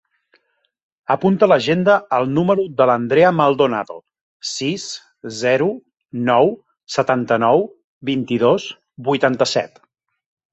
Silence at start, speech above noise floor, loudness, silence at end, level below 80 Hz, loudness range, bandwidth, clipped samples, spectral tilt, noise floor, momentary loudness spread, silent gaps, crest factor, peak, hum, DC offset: 1.1 s; 51 dB; -17 LUFS; 0.85 s; -60 dBFS; 4 LU; 8.2 kHz; under 0.1%; -5.5 dB/octave; -67 dBFS; 17 LU; 4.21-4.40 s, 7.84-8.01 s; 18 dB; -2 dBFS; none; under 0.1%